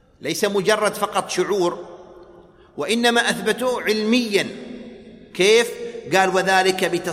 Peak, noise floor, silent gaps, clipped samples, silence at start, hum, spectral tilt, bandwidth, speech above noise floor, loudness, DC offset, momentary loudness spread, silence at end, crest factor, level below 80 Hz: -2 dBFS; -47 dBFS; none; under 0.1%; 0.2 s; none; -3 dB/octave; 16 kHz; 28 dB; -19 LUFS; under 0.1%; 18 LU; 0 s; 18 dB; -60 dBFS